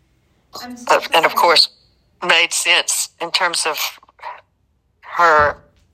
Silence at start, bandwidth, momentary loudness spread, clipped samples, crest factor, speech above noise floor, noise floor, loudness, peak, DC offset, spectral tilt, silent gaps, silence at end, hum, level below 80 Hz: 0.55 s; 15 kHz; 22 LU; under 0.1%; 18 dB; 47 dB; -63 dBFS; -15 LUFS; 0 dBFS; under 0.1%; 0 dB/octave; none; 0.4 s; none; -54 dBFS